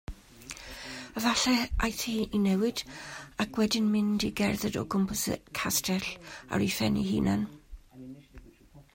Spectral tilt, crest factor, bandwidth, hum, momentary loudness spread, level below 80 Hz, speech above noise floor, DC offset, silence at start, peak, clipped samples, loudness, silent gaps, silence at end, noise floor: -4 dB/octave; 16 dB; 16.5 kHz; none; 17 LU; -46 dBFS; 26 dB; under 0.1%; 0.1 s; -14 dBFS; under 0.1%; -29 LUFS; none; 0.15 s; -55 dBFS